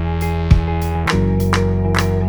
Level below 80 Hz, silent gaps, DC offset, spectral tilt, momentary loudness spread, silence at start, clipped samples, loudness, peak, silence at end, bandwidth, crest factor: -22 dBFS; none; 0.3%; -6.5 dB/octave; 4 LU; 0 s; under 0.1%; -17 LUFS; 0 dBFS; 0 s; over 20 kHz; 16 dB